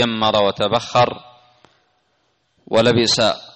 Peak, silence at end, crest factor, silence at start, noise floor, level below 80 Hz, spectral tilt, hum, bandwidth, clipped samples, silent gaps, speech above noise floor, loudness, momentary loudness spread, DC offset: -4 dBFS; 0.1 s; 14 dB; 0 s; -65 dBFS; -52 dBFS; -4 dB/octave; none; 8.8 kHz; under 0.1%; none; 48 dB; -17 LUFS; 6 LU; under 0.1%